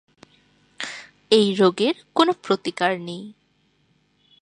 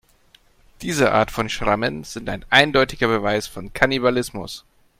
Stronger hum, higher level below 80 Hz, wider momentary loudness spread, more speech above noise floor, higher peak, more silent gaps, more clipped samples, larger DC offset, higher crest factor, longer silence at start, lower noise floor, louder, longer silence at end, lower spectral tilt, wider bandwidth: neither; second, -70 dBFS vs -44 dBFS; about the same, 17 LU vs 16 LU; first, 44 dB vs 35 dB; about the same, -2 dBFS vs 0 dBFS; neither; neither; neither; about the same, 22 dB vs 22 dB; about the same, 0.8 s vs 0.8 s; first, -65 dBFS vs -55 dBFS; about the same, -21 LUFS vs -20 LUFS; first, 1.1 s vs 0.4 s; about the same, -5 dB/octave vs -4 dB/octave; second, 11 kHz vs 16.5 kHz